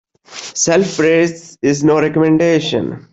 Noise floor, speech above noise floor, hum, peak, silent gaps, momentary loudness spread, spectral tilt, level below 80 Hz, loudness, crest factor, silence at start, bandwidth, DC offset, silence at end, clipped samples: -33 dBFS; 20 dB; none; -2 dBFS; none; 9 LU; -4.5 dB/octave; -52 dBFS; -14 LUFS; 12 dB; 0.3 s; 8.2 kHz; under 0.1%; 0.1 s; under 0.1%